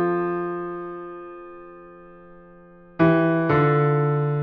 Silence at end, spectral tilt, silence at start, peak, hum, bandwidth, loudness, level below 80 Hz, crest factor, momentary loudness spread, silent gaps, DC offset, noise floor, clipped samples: 0 s; -7.5 dB/octave; 0 s; -8 dBFS; none; 4.9 kHz; -21 LUFS; -56 dBFS; 16 dB; 23 LU; none; under 0.1%; -48 dBFS; under 0.1%